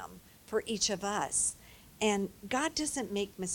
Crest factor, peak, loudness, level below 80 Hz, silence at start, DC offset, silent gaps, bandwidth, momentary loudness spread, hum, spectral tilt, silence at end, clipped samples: 20 dB; -16 dBFS; -33 LUFS; -62 dBFS; 0 s; under 0.1%; none; 18 kHz; 6 LU; none; -2.5 dB/octave; 0 s; under 0.1%